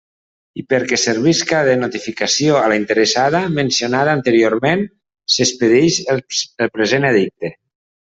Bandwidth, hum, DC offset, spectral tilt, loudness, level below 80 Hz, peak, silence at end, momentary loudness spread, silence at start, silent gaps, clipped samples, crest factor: 8 kHz; none; under 0.1%; -4 dB/octave; -15 LUFS; -56 dBFS; 0 dBFS; 0.55 s; 9 LU; 0.55 s; none; under 0.1%; 16 dB